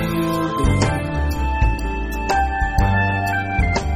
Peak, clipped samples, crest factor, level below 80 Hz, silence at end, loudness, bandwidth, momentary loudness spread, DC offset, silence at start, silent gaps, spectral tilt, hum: -2 dBFS; under 0.1%; 16 dB; -24 dBFS; 0 s; -20 LUFS; 15.5 kHz; 4 LU; under 0.1%; 0 s; none; -6 dB/octave; none